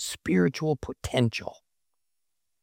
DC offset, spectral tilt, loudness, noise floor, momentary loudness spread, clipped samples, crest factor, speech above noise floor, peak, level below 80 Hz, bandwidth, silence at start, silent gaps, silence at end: under 0.1%; -5.5 dB/octave; -27 LUFS; -84 dBFS; 10 LU; under 0.1%; 20 dB; 57 dB; -8 dBFS; -52 dBFS; 16.5 kHz; 0 s; none; 1.1 s